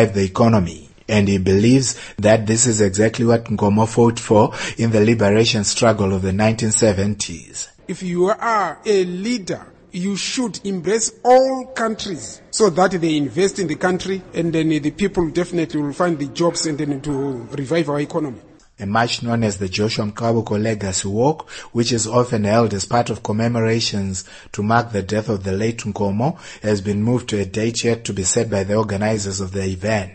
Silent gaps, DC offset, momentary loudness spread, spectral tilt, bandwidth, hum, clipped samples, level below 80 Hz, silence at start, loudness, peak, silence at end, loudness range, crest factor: none; under 0.1%; 10 LU; -5 dB/octave; 9 kHz; none; under 0.1%; -48 dBFS; 0 s; -19 LUFS; 0 dBFS; 0 s; 5 LU; 18 dB